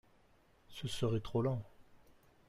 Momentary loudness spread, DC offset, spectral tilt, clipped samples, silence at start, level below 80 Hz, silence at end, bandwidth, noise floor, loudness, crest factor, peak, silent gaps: 17 LU; under 0.1%; -6.5 dB/octave; under 0.1%; 0.7 s; -62 dBFS; 0.5 s; 15 kHz; -68 dBFS; -38 LUFS; 16 dB; -24 dBFS; none